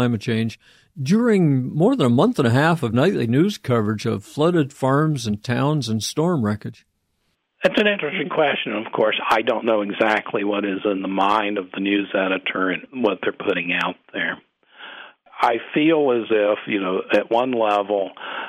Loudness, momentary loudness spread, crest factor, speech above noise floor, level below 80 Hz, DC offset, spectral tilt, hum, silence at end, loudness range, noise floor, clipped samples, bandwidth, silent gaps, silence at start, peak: -20 LUFS; 8 LU; 16 dB; 50 dB; -62 dBFS; under 0.1%; -6 dB/octave; none; 0 s; 4 LU; -70 dBFS; under 0.1%; 16 kHz; none; 0 s; -6 dBFS